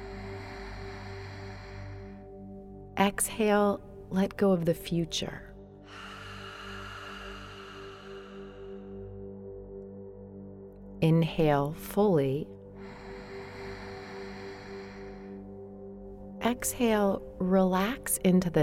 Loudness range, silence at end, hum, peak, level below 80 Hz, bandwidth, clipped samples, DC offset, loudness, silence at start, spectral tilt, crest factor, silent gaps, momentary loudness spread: 14 LU; 0 s; 50 Hz at -55 dBFS; -10 dBFS; -52 dBFS; 16 kHz; under 0.1%; under 0.1%; -29 LUFS; 0 s; -5.5 dB/octave; 20 dB; none; 20 LU